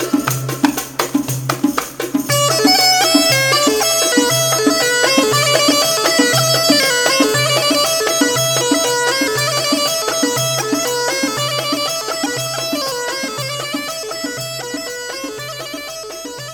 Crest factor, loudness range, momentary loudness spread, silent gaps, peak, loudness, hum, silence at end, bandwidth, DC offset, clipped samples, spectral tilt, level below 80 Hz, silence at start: 16 dB; 9 LU; 12 LU; none; 0 dBFS; -14 LUFS; none; 0 s; over 20 kHz; under 0.1%; under 0.1%; -2.5 dB/octave; -52 dBFS; 0 s